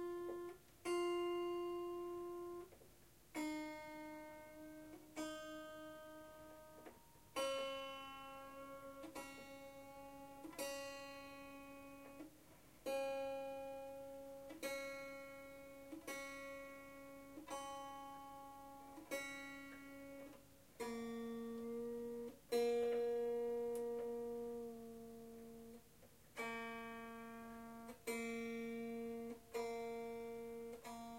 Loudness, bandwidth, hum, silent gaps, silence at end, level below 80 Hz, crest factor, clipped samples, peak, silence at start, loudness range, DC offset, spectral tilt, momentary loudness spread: -48 LUFS; 16 kHz; none; none; 0 s; -76 dBFS; 20 dB; under 0.1%; -30 dBFS; 0 s; 9 LU; under 0.1%; -3.5 dB/octave; 15 LU